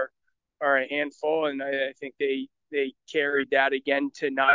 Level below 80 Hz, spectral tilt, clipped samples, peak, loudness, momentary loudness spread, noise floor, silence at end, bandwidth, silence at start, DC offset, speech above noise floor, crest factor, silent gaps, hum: -78 dBFS; -4 dB/octave; under 0.1%; -6 dBFS; -27 LUFS; 7 LU; -78 dBFS; 0 s; 7.6 kHz; 0 s; under 0.1%; 53 dB; 20 dB; none; none